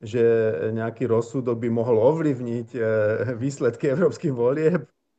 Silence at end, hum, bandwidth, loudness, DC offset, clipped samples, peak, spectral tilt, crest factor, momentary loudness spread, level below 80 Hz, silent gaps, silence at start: 0.35 s; none; 8.4 kHz; -23 LUFS; under 0.1%; under 0.1%; -8 dBFS; -8 dB/octave; 16 dB; 7 LU; -66 dBFS; none; 0 s